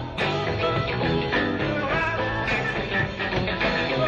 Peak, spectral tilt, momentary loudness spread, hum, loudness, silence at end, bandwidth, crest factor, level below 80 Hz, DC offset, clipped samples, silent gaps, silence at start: -12 dBFS; -6 dB/octave; 2 LU; none; -24 LUFS; 0 s; 8.8 kHz; 14 dB; -40 dBFS; under 0.1%; under 0.1%; none; 0 s